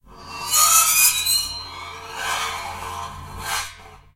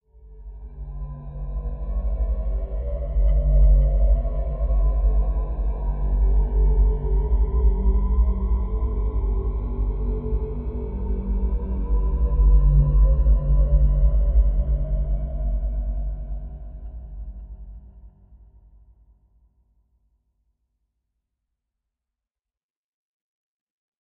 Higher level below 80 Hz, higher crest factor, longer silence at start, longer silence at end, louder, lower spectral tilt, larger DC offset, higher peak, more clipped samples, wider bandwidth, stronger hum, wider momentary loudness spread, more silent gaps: second, -48 dBFS vs -22 dBFS; first, 20 dB vs 14 dB; second, 0.1 s vs 0.25 s; second, 0.2 s vs 5.95 s; first, -17 LUFS vs -24 LUFS; second, 1.5 dB/octave vs -12 dB/octave; neither; first, -2 dBFS vs -8 dBFS; neither; first, 16 kHz vs 1.2 kHz; neither; first, 21 LU vs 18 LU; neither